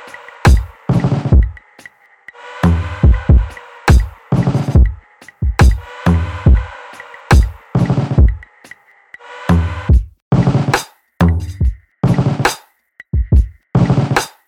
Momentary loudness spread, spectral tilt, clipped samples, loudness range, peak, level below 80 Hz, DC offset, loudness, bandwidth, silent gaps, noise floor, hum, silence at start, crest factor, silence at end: 13 LU; -7 dB/octave; under 0.1%; 2 LU; 0 dBFS; -18 dBFS; under 0.1%; -15 LUFS; 13.5 kHz; 10.22-10.31 s; -44 dBFS; none; 0.05 s; 14 dB; 0.2 s